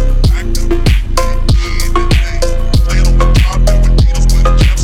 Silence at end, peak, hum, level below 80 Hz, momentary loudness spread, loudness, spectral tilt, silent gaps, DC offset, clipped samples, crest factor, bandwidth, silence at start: 0 s; 0 dBFS; none; -10 dBFS; 5 LU; -13 LUFS; -5.5 dB/octave; none; under 0.1%; under 0.1%; 8 dB; 14.5 kHz; 0 s